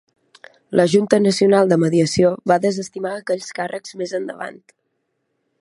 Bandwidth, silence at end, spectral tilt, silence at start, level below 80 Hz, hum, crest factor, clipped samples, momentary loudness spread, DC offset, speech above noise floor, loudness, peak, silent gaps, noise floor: 11.5 kHz; 1.05 s; -5.5 dB/octave; 0.7 s; -58 dBFS; none; 18 dB; under 0.1%; 13 LU; under 0.1%; 54 dB; -18 LUFS; 0 dBFS; none; -72 dBFS